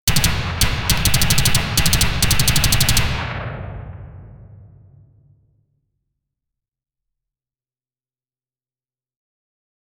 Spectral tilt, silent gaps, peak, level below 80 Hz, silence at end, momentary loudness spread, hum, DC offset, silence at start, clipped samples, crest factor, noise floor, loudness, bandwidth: -2.5 dB/octave; none; 0 dBFS; -28 dBFS; 5.25 s; 18 LU; none; under 0.1%; 0.05 s; under 0.1%; 20 dB; under -90 dBFS; -17 LUFS; over 20 kHz